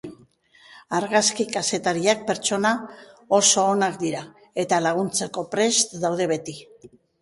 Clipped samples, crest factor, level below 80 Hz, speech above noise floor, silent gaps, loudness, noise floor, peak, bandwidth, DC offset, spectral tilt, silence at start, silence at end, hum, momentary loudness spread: under 0.1%; 20 dB; -66 dBFS; 32 dB; none; -22 LUFS; -55 dBFS; -4 dBFS; 11.5 kHz; under 0.1%; -2.5 dB/octave; 0.05 s; 0.35 s; none; 12 LU